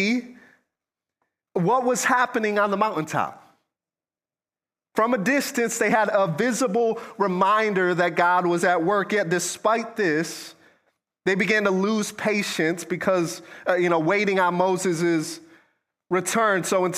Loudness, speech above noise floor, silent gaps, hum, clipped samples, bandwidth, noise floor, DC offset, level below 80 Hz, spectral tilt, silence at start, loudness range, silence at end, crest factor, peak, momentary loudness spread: -22 LUFS; over 68 dB; none; none; under 0.1%; 15.5 kHz; under -90 dBFS; under 0.1%; -72 dBFS; -4.5 dB/octave; 0 s; 4 LU; 0 s; 18 dB; -6 dBFS; 7 LU